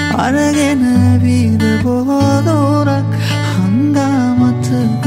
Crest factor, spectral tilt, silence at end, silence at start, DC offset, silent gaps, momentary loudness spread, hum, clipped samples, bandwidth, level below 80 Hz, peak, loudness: 12 dB; -6.5 dB/octave; 0 s; 0 s; under 0.1%; none; 4 LU; none; under 0.1%; 15.5 kHz; -46 dBFS; 0 dBFS; -13 LUFS